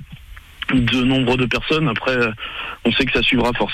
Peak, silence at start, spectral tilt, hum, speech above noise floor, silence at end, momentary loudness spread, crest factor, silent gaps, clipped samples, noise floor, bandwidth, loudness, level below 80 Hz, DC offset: -6 dBFS; 0 s; -6 dB/octave; none; 21 dB; 0 s; 7 LU; 12 dB; none; under 0.1%; -39 dBFS; 14 kHz; -18 LUFS; -36 dBFS; under 0.1%